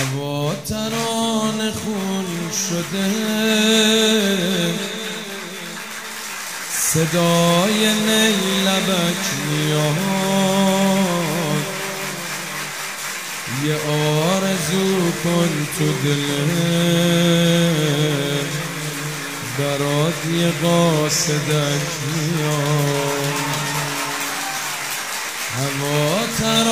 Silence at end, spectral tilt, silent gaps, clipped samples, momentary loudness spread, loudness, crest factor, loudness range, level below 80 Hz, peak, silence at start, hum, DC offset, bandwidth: 0 s; -4 dB/octave; none; under 0.1%; 10 LU; -19 LUFS; 18 dB; 4 LU; -56 dBFS; -2 dBFS; 0 s; none; 0.3%; 16 kHz